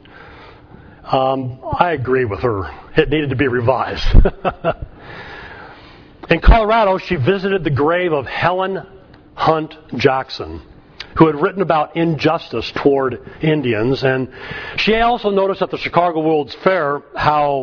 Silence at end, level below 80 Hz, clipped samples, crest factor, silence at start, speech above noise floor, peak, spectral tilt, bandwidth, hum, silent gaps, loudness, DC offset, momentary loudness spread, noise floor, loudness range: 0 s; -24 dBFS; under 0.1%; 16 dB; 0.15 s; 25 dB; 0 dBFS; -7.5 dB/octave; 5.4 kHz; none; none; -17 LUFS; under 0.1%; 13 LU; -41 dBFS; 3 LU